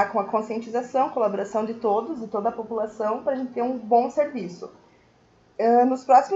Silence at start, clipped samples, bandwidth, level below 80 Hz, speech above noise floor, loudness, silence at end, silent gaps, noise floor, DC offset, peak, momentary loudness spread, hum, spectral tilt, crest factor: 0 s; under 0.1%; 7.8 kHz; -68 dBFS; 35 dB; -24 LUFS; 0 s; none; -58 dBFS; under 0.1%; -4 dBFS; 11 LU; none; -6.5 dB/octave; 18 dB